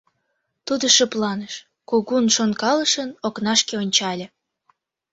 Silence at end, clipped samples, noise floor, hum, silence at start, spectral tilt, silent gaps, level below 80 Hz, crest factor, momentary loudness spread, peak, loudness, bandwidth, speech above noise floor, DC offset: 0.85 s; under 0.1%; -74 dBFS; none; 0.65 s; -2 dB/octave; none; -66 dBFS; 20 dB; 16 LU; -2 dBFS; -19 LUFS; 8 kHz; 53 dB; under 0.1%